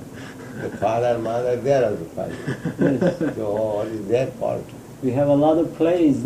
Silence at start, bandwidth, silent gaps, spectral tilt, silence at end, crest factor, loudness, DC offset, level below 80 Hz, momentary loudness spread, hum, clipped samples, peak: 0 s; 15 kHz; none; -7.5 dB/octave; 0 s; 16 dB; -22 LUFS; under 0.1%; -52 dBFS; 13 LU; none; under 0.1%; -6 dBFS